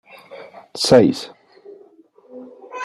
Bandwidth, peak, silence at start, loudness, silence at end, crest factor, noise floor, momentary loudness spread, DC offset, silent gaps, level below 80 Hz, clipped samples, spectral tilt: 13 kHz; -2 dBFS; 0.35 s; -16 LUFS; 0 s; 20 dB; -50 dBFS; 27 LU; under 0.1%; none; -58 dBFS; under 0.1%; -5 dB/octave